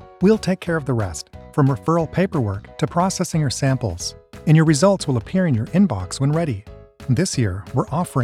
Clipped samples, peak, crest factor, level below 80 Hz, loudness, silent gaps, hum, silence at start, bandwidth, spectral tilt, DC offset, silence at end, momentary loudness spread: under 0.1%; -4 dBFS; 16 dB; -44 dBFS; -20 LUFS; none; none; 0.2 s; 13.5 kHz; -6 dB/octave; under 0.1%; 0 s; 10 LU